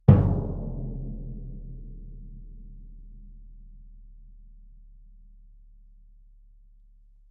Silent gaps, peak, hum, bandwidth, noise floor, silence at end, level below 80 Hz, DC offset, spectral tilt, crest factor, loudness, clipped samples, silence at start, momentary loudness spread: none; -2 dBFS; none; 3.5 kHz; -54 dBFS; 2.5 s; -40 dBFS; under 0.1%; -11.5 dB/octave; 28 dB; -28 LUFS; under 0.1%; 0.1 s; 26 LU